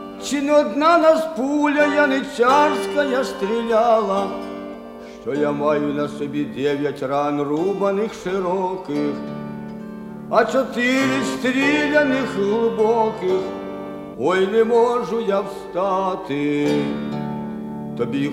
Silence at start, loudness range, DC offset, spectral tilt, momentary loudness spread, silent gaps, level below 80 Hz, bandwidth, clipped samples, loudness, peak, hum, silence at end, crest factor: 0 s; 5 LU; under 0.1%; -5.5 dB/octave; 14 LU; none; -54 dBFS; 15.5 kHz; under 0.1%; -20 LUFS; -2 dBFS; none; 0 s; 18 dB